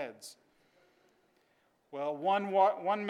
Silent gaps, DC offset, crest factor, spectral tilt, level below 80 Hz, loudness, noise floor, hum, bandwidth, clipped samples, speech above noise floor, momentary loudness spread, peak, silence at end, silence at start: none; under 0.1%; 20 dB; -5 dB/octave; under -90 dBFS; -31 LUFS; -72 dBFS; none; 13.5 kHz; under 0.1%; 41 dB; 21 LU; -14 dBFS; 0 s; 0 s